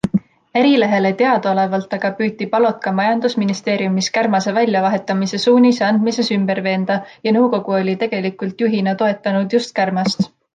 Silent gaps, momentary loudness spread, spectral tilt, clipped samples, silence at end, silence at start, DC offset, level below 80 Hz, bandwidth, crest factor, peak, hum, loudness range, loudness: none; 7 LU; -5.5 dB/octave; under 0.1%; 0.25 s; 0.05 s; under 0.1%; -60 dBFS; 9.2 kHz; 14 dB; -2 dBFS; none; 2 LU; -17 LUFS